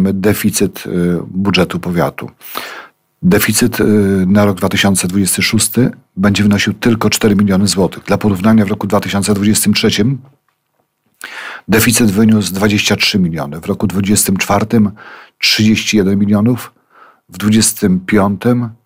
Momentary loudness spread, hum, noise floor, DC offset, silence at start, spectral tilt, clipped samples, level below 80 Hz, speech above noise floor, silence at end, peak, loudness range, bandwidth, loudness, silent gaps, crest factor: 8 LU; none; -64 dBFS; under 0.1%; 0 s; -4.5 dB/octave; under 0.1%; -42 dBFS; 52 dB; 0.1 s; 0 dBFS; 2 LU; 16.5 kHz; -12 LUFS; none; 12 dB